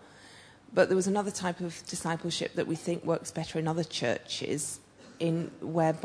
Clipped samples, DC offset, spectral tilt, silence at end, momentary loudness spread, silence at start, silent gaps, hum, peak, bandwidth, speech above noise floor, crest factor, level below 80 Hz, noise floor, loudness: under 0.1%; under 0.1%; -4.5 dB/octave; 0 s; 9 LU; 0 s; none; none; -12 dBFS; 11 kHz; 23 dB; 20 dB; -68 dBFS; -54 dBFS; -31 LUFS